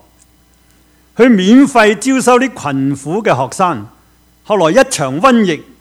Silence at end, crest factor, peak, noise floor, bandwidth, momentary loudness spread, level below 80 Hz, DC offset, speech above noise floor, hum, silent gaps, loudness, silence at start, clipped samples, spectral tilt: 0.2 s; 12 dB; 0 dBFS; -49 dBFS; 14 kHz; 9 LU; -50 dBFS; under 0.1%; 39 dB; none; none; -11 LUFS; 1.2 s; 0.4%; -5 dB/octave